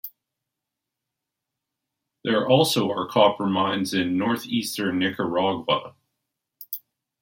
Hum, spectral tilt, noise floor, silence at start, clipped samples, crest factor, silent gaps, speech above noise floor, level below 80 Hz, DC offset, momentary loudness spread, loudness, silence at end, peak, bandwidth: none; -5 dB/octave; -85 dBFS; 0.05 s; under 0.1%; 22 dB; none; 62 dB; -68 dBFS; under 0.1%; 15 LU; -23 LUFS; 0.45 s; -4 dBFS; 16.5 kHz